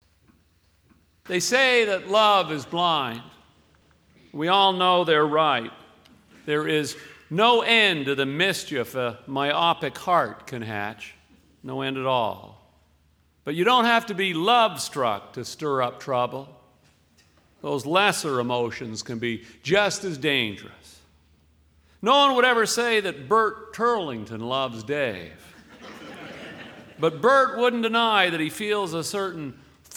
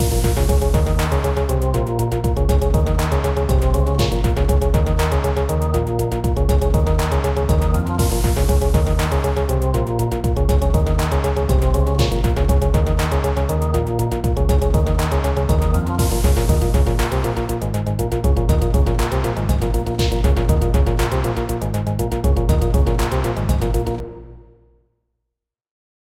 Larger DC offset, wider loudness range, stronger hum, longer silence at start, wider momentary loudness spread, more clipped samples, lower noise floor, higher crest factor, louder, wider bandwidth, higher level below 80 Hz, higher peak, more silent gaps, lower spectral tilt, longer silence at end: second, under 0.1% vs 0.2%; first, 5 LU vs 2 LU; neither; first, 1.25 s vs 0 s; first, 20 LU vs 4 LU; neither; second, -63 dBFS vs -81 dBFS; first, 20 dB vs 14 dB; second, -23 LUFS vs -19 LUFS; first, 19 kHz vs 16.5 kHz; second, -64 dBFS vs -20 dBFS; about the same, -4 dBFS vs -4 dBFS; neither; second, -3.5 dB/octave vs -6.5 dB/octave; second, 0 s vs 1.75 s